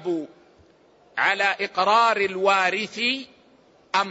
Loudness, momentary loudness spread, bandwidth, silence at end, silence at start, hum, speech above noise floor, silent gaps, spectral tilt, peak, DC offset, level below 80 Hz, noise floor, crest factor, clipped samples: -22 LUFS; 12 LU; 8 kHz; 0 s; 0 s; none; 34 dB; none; -3 dB/octave; -6 dBFS; under 0.1%; -72 dBFS; -56 dBFS; 18 dB; under 0.1%